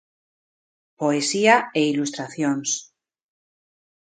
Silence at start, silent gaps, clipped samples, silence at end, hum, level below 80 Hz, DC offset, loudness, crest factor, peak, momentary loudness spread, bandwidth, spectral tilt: 1 s; none; under 0.1%; 1.35 s; none; -74 dBFS; under 0.1%; -21 LUFS; 22 dB; -2 dBFS; 10 LU; 9.6 kHz; -3.5 dB/octave